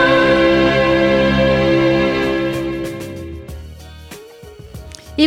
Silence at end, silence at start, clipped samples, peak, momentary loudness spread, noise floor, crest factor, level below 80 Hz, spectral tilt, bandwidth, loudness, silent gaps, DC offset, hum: 0 s; 0 s; under 0.1%; 0 dBFS; 23 LU; -37 dBFS; 16 dB; -34 dBFS; -6 dB/octave; 14.5 kHz; -14 LUFS; none; under 0.1%; none